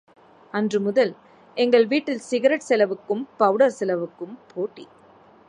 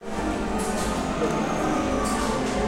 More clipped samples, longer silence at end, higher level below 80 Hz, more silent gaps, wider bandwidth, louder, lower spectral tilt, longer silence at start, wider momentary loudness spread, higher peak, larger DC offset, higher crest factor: neither; first, 0.65 s vs 0 s; second, -76 dBFS vs -36 dBFS; neither; second, 10.5 kHz vs 16 kHz; first, -22 LUFS vs -25 LUFS; about the same, -5 dB/octave vs -5 dB/octave; first, 0.55 s vs 0 s; first, 13 LU vs 2 LU; first, -4 dBFS vs -12 dBFS; neither; about the same, 18 dB vs 14 dB